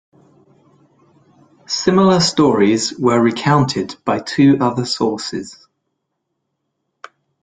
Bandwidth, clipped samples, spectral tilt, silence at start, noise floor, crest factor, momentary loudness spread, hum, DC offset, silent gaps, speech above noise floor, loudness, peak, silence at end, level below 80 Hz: 9.4 kHz; under 0.1%; -5 dB/octave; 1.7 s; -74 dBFS; 16 dB; 10 LU; none; under 0.1%; none; 59 dB; -15 LUFS; -2 dBFS; 1.9 s; -54 dBFS